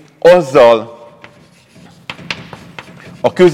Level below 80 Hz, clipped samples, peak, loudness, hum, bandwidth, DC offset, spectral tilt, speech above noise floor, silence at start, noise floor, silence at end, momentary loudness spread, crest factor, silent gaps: -50 dBFS; under 0.1%; 0 dBFS; -10 LUFS; none; 13 kHz; under 0.1%; -6 dB/octave; 36 dB; 0.25 s; -44 dBFS; 0 s; 24 LU; 14 dB; none